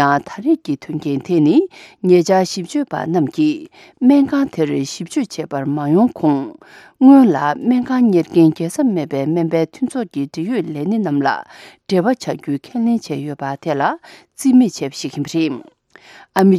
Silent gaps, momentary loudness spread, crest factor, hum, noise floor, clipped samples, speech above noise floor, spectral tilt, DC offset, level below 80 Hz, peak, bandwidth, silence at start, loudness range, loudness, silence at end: none; 11 LU; 16 dB; none; -44 dBFS; under 0.1%; 28 dB; -6.5 dB/octave; under 0.1%; -62 dBFS; 0 dBFS; 13.5 kHz; 0 s; 6 LU; -17 LUFS; 0 s